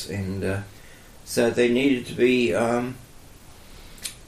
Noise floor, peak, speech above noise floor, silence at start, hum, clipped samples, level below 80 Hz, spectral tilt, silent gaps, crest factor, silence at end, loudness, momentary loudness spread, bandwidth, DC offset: -46 dBFS; -8 dBFS; 23 dB; 0 s; none; under 0.1%; -50 dBFS; -5 dB/octave; none; 16 dB; 0 s; -23 LUFS; 15 LU; 15.5 kHz; under 0.1%